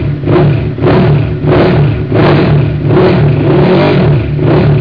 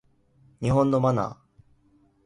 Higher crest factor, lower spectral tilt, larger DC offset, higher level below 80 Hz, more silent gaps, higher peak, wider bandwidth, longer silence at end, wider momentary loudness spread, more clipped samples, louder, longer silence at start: second, 8 dB vs 18 dB; first, -10.5 dB/octave vs -8.5 dB/octave; first, 0.8% vs under 0.1%; first, -24 dBFS vs -52 dBFS; neither; first, 0 dBFS vs -10 dBFS; second, 5.2 kHz vs 11 kHz; second, 0 s vs 0.9 s; second, 3 LU vs 10 LU; first, 0.9% vs under 0.1%; first, -8 LUFS vs -24 LUFS; second, 0 s vs 0.6 s